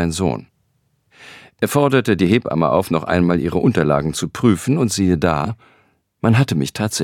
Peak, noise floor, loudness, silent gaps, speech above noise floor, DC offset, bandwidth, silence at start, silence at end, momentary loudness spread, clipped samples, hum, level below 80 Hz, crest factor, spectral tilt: -2 dBFS; -64 dBFS; -17 LUFS; none; 48 dB; under 0.1%; 17 kHz; 0 s; 0 s; 7 LU; under 0.1%; none; -44 dBFS; 16 dB; -6 dB/octave